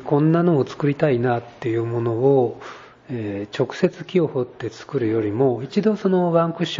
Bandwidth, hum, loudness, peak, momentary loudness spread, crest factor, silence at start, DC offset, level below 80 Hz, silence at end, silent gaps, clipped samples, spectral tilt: 7.6 kHz; none; -21 LUFS; -4 dBFS; 10 LU; 16 dB; 0 s; under 0.1%; -60 dBFS; 0 s; none; under 0.1%; -8 dB/octave